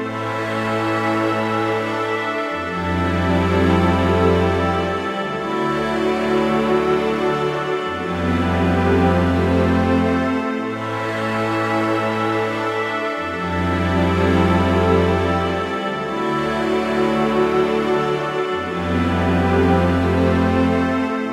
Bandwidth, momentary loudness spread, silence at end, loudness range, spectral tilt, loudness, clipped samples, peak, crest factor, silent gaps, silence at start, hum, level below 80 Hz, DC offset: 13 kHz; 6 LU; 0 s; 2 LU; -7 dB/octave; -19 LUFS; under 0.1%; -4 dBFS; 14 dB; none; 0 s; none; -38 dBFS; under 0.1%